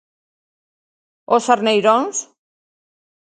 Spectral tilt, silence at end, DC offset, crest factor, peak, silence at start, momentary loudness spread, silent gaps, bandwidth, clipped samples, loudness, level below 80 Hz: -3 dB/octave; 1 s; under 0.1%; 20 dB; 0 dBFS; 1.3 s; 9 LU; none; 9.4 kHz; under 0.1%; -17 LUFS; -72 dBFS